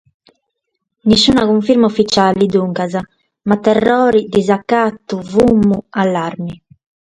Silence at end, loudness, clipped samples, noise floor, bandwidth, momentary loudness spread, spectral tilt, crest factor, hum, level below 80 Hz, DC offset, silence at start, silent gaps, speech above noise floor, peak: 0.55 s; -13 LUFS; under 0.1%; -74 dBFS; 10.5 kHz; 11 LU; -5.5 dB/octave; 14 dB; none; -44 dBFS; under 0.1%; 1.05 s; none; 61 dB; 0 dBFS